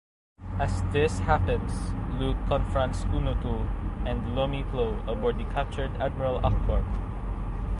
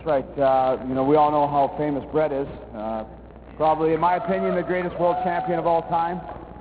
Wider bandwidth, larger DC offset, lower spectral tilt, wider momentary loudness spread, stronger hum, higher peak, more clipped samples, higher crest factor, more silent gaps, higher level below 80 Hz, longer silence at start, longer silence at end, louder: first, 11 kHz vs 4 kHz; neither; second, -7 dB/octave vs -10.5 dB/octave; second, 7 LU vs 11 LU; neither; about the same, -8 dBFS vs -8 dBFS; neither; first, 20 dB vs 14 dB; neither; first, -30 dBFS vs -48 dBFS; first, 0.4 s vs 0 s; about the same, 0 s vs 0 s; second, -29 LUFS vs -22 LUFS